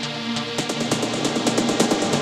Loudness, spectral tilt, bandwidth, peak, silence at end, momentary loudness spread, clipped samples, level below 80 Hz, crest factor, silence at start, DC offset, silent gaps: -22 LUFS; -3.5 dB/octave; 16 kHz; -2 dBFS; 0 s; 5 LU; under 0.1%; -58 dBFS; 20 dB; 0 s; under 0.1%; none